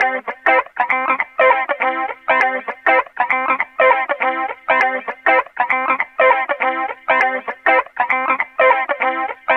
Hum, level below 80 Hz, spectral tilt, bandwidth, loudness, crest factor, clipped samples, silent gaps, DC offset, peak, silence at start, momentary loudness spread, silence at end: none; -66 dBFS; -3.5 dB/octave; 6.6 kHz; -16 LUFS; 14 dB; under 0.1%; none; under 0.1%; -2 dBFS; 0 s; 5 LU; 0 s